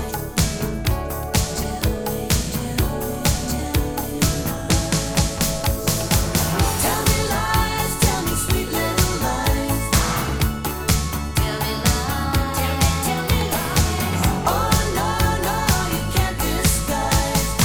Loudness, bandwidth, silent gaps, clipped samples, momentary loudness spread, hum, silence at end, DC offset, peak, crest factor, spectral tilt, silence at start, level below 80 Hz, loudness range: -21 LUFS; over 20 kHz; none; under 0.1%; 4 LU; none; 0 s; under 0.1%; -2 dBFS; 18 dB; -4 dB/octave; 0 s; -28 dBFS; 3 LU